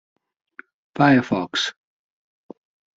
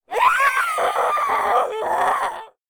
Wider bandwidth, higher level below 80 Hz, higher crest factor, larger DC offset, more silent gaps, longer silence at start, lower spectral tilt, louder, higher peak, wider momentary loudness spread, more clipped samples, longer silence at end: second, 7.8 kHz vs over 20 kHz; about the same, -64 dBFS vs -60 dBFS; about the same, 20 dB vs 16 dB; neither; neither; first, 0.95 s vs 0.1 s; first, -5 dB/octave vs -1 dB/octave; about the same, -20 LUFS vs -19 LUFS; about the same, -4 dBFS vs -4 dBFS; first, 11 LU vs 6 LU; neither; first, 1.25 s vs 0.25 s